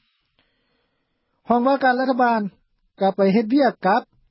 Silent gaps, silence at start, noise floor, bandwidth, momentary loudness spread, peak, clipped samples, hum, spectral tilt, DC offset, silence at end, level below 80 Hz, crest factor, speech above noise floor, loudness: none; 1.5 s; -71 dBFS; 5.8 kHz; 6 LU; -6 dBFS; under 0.1%; none; -11 dB/octave; under 0.1%; 0.3 s; -68 dBFS; 16 dB; 53 dB; -19 LUFS